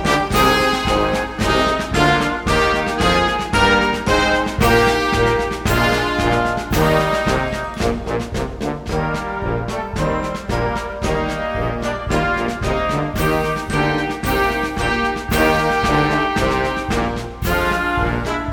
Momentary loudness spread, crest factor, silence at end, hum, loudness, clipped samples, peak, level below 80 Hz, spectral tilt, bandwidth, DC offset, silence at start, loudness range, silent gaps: 8 LU; 16 dB; 0 s; none; -18 LUFS; under 0.1%; -2 dBFS; -30 dBFS; -5 dB/octave; 17.5 kHz; under 0.1%; 0 s; 6 LU; none